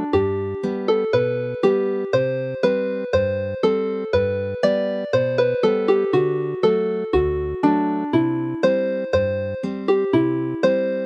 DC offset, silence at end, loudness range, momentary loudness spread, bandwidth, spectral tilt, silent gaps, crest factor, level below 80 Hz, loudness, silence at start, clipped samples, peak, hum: under 0.1%; 0 s; 1 LU; 5 LU; 7.8 kHz; -8 dB/octave; none; 16 dB; -44 dBFS; -21 LUFS; 0 s; under 0.1%; -4 dBFS; none